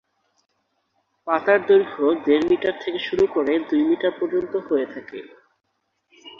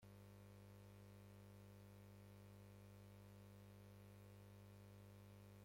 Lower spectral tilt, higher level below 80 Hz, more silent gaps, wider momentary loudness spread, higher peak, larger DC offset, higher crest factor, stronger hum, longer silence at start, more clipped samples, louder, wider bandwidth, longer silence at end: about the same, -6.5 dB/octave vs -6.5 dB/octave; first, -60 dBFS vs -76 dBFS; neither; first, 13 LU vs 0 LU; first, -4 dBFS vs -52 dBFS; neither; first, 18 dB vs 10 dB; second, none vs 50 Hz at -65 dBFS; first, 1.25 s vs 0 s; neither; first, -21 LUFS vs -64 LUFS; second, 7 kHz vs 16.5 kHz; about the same, 0.1 s vs 0 s